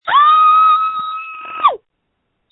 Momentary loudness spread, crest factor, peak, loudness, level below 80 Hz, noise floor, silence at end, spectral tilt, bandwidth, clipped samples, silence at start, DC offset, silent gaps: 18 LU; 14 dB; 0 dBFS; -11 LUFS; -62 dBFS; -70 dBFS; 0.75 s; -4.5 dB/octave; 4.1 kHz; under 0.1%; 0.05 s; under 0.1%; none